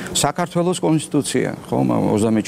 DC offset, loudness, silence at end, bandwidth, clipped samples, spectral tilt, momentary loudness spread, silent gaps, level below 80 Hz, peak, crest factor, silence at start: under 0.1%; -19 LUFS; 0 s; 16 kHz; under 0.1%; -5 dB/octave; 4 LU; none; -50 dBFS; -2 dBFS; 16 dB; 0 s